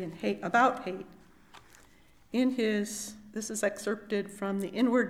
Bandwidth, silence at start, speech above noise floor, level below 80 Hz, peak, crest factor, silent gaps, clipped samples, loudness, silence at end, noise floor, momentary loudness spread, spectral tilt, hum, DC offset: 15.5 kHz; 0 s; 29 dB; -66 dBFS; -10 dBFS; 20 dB; none; under 0.1%; -31 LUFS; 0 s; -59 dBFS; 14 LU; -4.5 dB/octave; none; under 0.1%